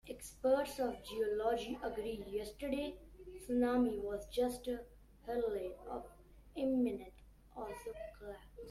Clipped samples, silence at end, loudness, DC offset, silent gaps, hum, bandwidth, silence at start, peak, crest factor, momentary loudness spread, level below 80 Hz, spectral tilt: under 0.1%; 0 s; -39 LUFS; under 0.1%; none; none; 14.5 kHz; 0.05 s; -22 dBFS; 18 dB; 18 LU; -60 dBFS; -5 dB/octave